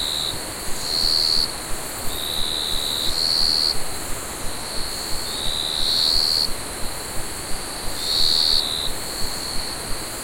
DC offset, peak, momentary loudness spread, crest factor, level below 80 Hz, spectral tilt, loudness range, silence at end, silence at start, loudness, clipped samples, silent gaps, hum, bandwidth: under 0.1%; -4 dBFS; 12 LU; 18 dB; -36 dBFS; -1 dB/octave; 2 LU; 0 s; 0 s; -21 LUFS; under 0.1%; none; none; 16.5 kHz